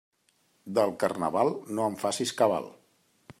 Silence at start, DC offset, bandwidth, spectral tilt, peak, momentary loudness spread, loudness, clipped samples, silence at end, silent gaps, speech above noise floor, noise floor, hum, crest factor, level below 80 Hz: 0.65 s; under 0.1%; 16 kHz; -4.5 dB/octave; -10 dBFS; 5 LU; -28 LUFS; under 0.1%; 0.7 s; none; 42 dB; -69 dBFS; none; 20 dB; -74 dBFS